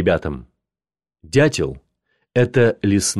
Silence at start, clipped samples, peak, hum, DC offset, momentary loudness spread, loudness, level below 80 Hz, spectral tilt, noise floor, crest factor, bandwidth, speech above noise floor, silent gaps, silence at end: 0 s; under 0.1%; -4 dBFS; none; under 0.1%; 11 LU; -19 LUFS; -42 dBFS; -5 dB/octave; under -90 dBFS; 16 dB; 13.5 kHz; over 73 dB; none; 0 s